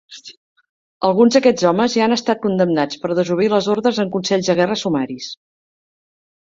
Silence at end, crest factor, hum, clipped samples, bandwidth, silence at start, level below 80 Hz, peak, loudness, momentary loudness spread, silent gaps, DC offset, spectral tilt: 1.15 s; 16 dB; none; under 0.1%; 7.6 kHz; 0.1 s; -60 dBFS; -2 dBFS; -17 LUFS; 13 LU; 0.37-0.56 s, 0.69-1.01 s; under 0.1%; -5 dB/octave